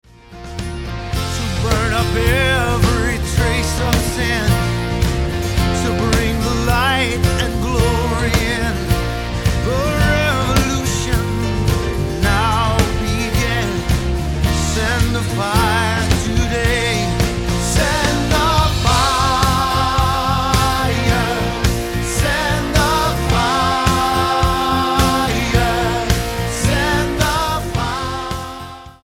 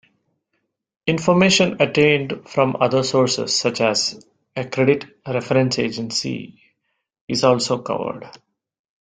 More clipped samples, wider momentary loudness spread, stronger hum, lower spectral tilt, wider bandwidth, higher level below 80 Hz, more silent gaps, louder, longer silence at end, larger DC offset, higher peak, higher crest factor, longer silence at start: neither; second, 5 LU vs 11 LU; neither; about the same, -4.5 dB/octave vs -4.5 dB/octave; first, 17 kHz vs 9.6 kHz; first, -24 dBFS vs -58 dBFS; second, none vs 7.21-7.28 s; about the same, -17 LUFS vs -19 LUFS; second, 0.1 s vs 0.7 s; neither; about the same, 0 dBFS vs -2 dBFS; about the same, 16 dB vs 18 dB; second, 0.3 s vs 1.05 s